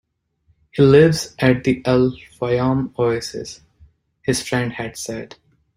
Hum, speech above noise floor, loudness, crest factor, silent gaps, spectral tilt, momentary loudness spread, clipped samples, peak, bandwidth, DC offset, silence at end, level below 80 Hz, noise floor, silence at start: none; 45 dB; -18 LUFS; 18 dB; none; -6 dB/octave; 17 LU; under 0.1%; -2 dBFS; 16 kHz; under 0.1%; 0.5 s; -48 dBFS; -63 dBFS; 0.75 s